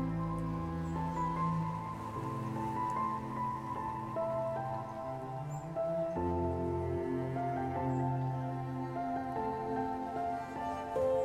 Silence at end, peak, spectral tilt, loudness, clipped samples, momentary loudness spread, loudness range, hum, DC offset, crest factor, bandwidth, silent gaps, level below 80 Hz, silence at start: 0 s; -22 dBFS; -8.5 dB/octave; -37 LUFS; under 0.1%; 5 LU; 2 LU; none; under 0.1%; 14 dB; 14 kHz; none; -56 dBFS; 0 s